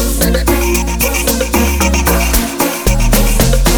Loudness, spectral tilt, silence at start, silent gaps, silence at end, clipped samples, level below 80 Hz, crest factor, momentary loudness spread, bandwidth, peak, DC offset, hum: -12 LUFS; -4 dB/octave; 0 s; none; 0 s; under 0.1%; -14 dBFS; 12 dB; 3 LU; over 20 kHz; 0 dBFS; under 0.1%; none